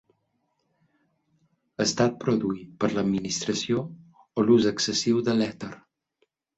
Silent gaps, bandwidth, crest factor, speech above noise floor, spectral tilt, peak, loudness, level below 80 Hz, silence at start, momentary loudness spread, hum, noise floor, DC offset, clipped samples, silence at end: none; 8.2 kHz; 18 dB; 49 dB; -4.5 dB/octave; -8 dBFS; -25 LUFS; -62 dBFS; 1.8 s; 13 LU; none; -74 dBFS; under 0.1%; under 0.1%; 0.8 s